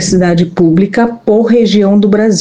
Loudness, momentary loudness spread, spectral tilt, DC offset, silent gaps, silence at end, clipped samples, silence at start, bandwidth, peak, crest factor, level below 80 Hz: -9 LUFS; 3 LU; -6 dB/octave; 0.6%; none; 0 s; under 0.1%; 0 s; 9.6 kHz; 0 dBFS; 8 dB; -40 dBFS